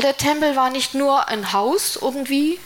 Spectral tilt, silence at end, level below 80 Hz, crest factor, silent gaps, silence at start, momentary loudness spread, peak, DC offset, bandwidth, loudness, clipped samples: -3 dB/octave; 0 s; -54 dBFS; 16 dB; none; 0 s; 3 LU; -4 dBFS; under 0.1%; 17 kHz; -19 LUFS; under 0.1%